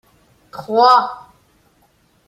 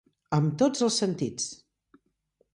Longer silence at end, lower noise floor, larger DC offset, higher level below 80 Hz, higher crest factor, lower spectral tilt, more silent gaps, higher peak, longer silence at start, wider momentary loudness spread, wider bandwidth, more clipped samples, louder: about the same, 1.1 s vs 1 s; second, -58 dBFS vs -72 dBFS; neither; about the same, -64 dBFS vs -66 dBFS; about the same, 18 dB vs 18 dB; about the same, -4 dB/octave vs -5 dB/octave; neither; first, -2 dBFS vs -12 dBFS; first, 0.55 s vs 0.3 s; first, 25 LU vs 9 LU; first, 14 kHz vs 11.5 kHz; neither; first, -14 LUFS vs -27 LUFS